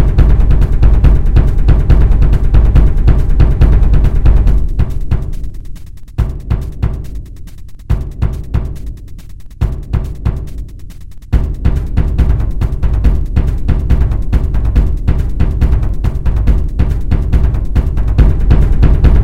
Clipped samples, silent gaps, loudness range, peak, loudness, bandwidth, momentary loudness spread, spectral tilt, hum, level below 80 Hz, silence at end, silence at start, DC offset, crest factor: 1%; none; 10 LU; 0 dBFS; -14 LUFS; 4.8 kHz; 16 LU; -9 dB/octave; none; -12 dBFS; 0 s; 0 s; 7%; 10 dB